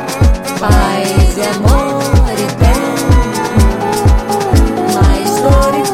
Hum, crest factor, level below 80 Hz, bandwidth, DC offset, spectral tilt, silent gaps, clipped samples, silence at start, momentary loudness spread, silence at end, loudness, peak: none; 10 dB; -14 dBFS; 16 kHz; 0.1%; -5.5 dB/octave; none; under 0.1%; 0 s; 3 LU; 0 s; -12 LUFS; 0 dBFS